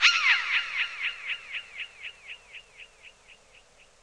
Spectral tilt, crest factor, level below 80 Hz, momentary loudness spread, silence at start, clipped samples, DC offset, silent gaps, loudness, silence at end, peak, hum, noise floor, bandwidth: 3.5 dB/octave; 24 dB; -68 dBFS; 25 LU; 0 s; under 0.1%; under 0.1%; none; -26 LUFS; 0.7 s; -6 dBFS; none; -57 dBFS; 11.5 kHz